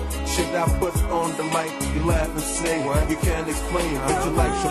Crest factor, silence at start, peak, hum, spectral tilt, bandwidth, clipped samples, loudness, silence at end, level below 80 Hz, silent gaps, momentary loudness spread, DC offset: 16 dB; 0 s; -6 dBFS; none; -5 dB/octave; 13 kHz; under 0.1%; -23 LUFS; 0 s; -28 dBFS; none; 3 LU; under 0.1%